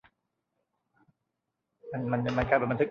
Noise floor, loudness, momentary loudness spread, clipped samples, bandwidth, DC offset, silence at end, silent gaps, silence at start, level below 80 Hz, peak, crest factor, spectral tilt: -84 dBFS; -29 LUFS; 10 LU; under 0.1%; 7 kHz; under 0.1%; 0 s; none; 1.85 s; -52 dBFS; -10 dBFS; 22 dB; -8 dB/octave